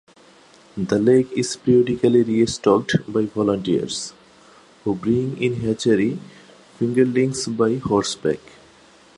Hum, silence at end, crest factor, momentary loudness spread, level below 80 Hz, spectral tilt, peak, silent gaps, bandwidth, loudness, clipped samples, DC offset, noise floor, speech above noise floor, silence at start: none; 0.8 s; 18 dB; 10 LU; -54 dBFS; -5.5 dB/octave; -2 dBFS; none; 11 kHz; -20 LUFS; under 0.1%; under 0.1%; -50 dBFS; 31 dB; 0.75 s